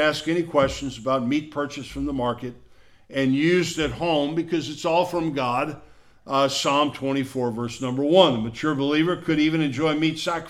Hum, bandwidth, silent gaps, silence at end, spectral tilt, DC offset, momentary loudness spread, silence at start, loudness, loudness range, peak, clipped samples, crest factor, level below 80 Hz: none; 14.5 kHz; none; 0 s; -5 dB/octave; under 0.1%; 9 LU; 0 s; -23 LUFS; 3 LU; -2 dBFS; under 0.1%; 22 dB; -50 dBFS